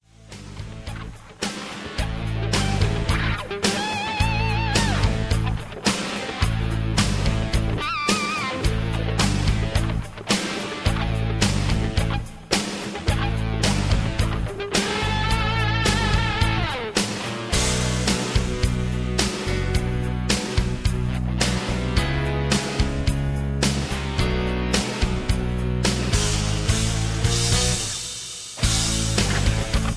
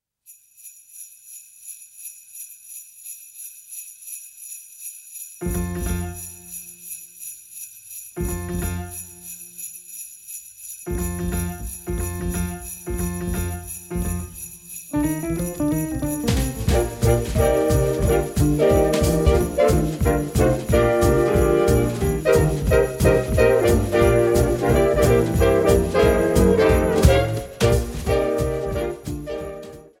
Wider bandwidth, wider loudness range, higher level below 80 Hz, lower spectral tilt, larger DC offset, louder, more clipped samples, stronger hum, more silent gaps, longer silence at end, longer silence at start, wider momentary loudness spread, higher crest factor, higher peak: second, 11 kHz vs 16 kHz; second, 2 LU vs 15 LU; about the same, -28 dBFS vs -30 dBFS; second, -4 dB/octave vs -6 dB/octave; neither; second, -23 LUFS vs -20 LUFS; neither; neither; neither; second, 0 s vs 0.2 s; about the same, 0.25 s vs 0.3 s; second, 7 LU vs 18 LU; about the same, 20 dB vs 20 dB; second, -4 dBFS vs 0 dBFS